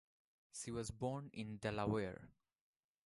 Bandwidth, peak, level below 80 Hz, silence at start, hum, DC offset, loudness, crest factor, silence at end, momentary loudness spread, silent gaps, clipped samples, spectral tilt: 11.5 kHz; -26 dBFS; -66 dBFS; 0.55 s; none; under 0.1%; -44 LUFS; 20 dB; 0.8 s; 11 LU; none; under 0.1%; -5.5 dB/octave